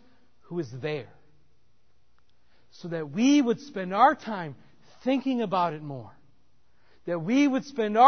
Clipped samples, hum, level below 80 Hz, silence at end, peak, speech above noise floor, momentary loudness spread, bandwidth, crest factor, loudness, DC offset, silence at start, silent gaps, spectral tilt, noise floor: under 0.1%; none; -72 dBFS; 0 s; -6 dBFS; 45 dB; 16 LU; 6.6 kHz; 22 dB; -27 LUFS; 0.2%; 0.5 s; none; -5.5 dB/octave; -70 dBFS